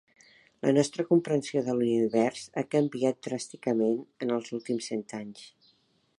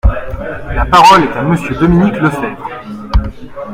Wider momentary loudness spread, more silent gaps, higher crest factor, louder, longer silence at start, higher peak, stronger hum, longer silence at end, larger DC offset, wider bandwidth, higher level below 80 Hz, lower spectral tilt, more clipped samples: second, 10 LU vs 19 LU; neither; first, 18 dB vs 12 dB; second, -29 LUFS vs -11 LUFS; first, 0.65 s vs 0.05 s; second, -10 dBFS vs 0 dBFS; neither; first, 0.7 s vs 0 s; neither; second, 11 kHz vs 16 kHz; second, -76 dBFS vs -20 dBFS; about the same, -6 dB/octave vs -6 dB/octave; second, under 0.1% vs 0.8%